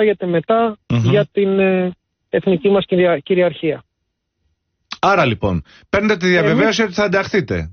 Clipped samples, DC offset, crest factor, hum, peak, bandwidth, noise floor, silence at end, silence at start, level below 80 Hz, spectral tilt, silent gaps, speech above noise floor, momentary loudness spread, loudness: under 0.1%; under 0.1%; 14 dB; none; -2 dBFS; 6.6 kHz; -74 dBFS; 0 s; 0 s; -44 dBFS; -5 dB/octave; none; 58 dB; 8 LU; -16 LUFS